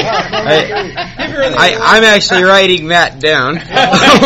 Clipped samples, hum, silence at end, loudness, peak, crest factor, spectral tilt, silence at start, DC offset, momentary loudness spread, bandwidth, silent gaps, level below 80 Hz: 1%; none; 0 s; -9 LUFS; 0 dBFS; 10 dB; -3.5 dB/octave; 0 s; under 0.1%; 11 LU; over 20 kHz; none; -36 dBFS